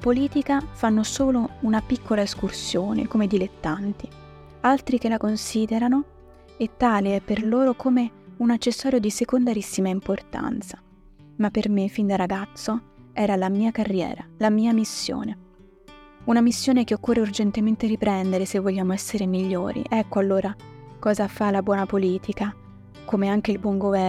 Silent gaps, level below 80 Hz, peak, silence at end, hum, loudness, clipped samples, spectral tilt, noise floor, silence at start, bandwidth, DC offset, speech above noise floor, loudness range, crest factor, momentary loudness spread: none; -48 dBFS; -6 dBFS; 0 s; none; -24 LUFS; under 0.1%; -5.5 dB/octave; -50 dBFS; 0 s; 14 kHz; under 0.1%; 27 dB; 3 LU; 16 dB; 9 LU